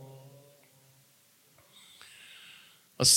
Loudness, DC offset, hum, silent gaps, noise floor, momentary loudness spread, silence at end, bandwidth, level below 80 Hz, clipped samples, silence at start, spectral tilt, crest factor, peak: -31 LUFS; under 0.1%; none; none; -64 dBFS; 10 LU; 0 s; 17 kHz; -68 dBFS; under 0.1%; 3 s; -1.5 dB/octave; 26 dB; -8 dBFS